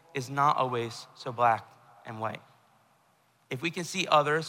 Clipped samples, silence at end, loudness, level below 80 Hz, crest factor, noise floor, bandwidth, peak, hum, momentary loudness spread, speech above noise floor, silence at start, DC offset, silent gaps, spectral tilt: under 0.1%; 0 s; -29 LUFS; -76 dBFS; 22 dB; -67 dBFS; 16 kHz; -10 dBFS; none; 15 LU; 38 dB; 0.15 s; under 0.1%; none; -4.5 dB/octave